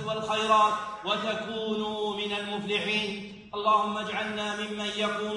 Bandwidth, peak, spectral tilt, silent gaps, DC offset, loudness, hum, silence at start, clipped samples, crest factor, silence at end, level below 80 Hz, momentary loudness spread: 10.5 kHz; -10 dBFS; -3.5 dB/octave; none; under 0.1%; -28 LUFS; none; 0 s; under 0.1%; 18 dB; 0 s; -64 dBFS; 8 LU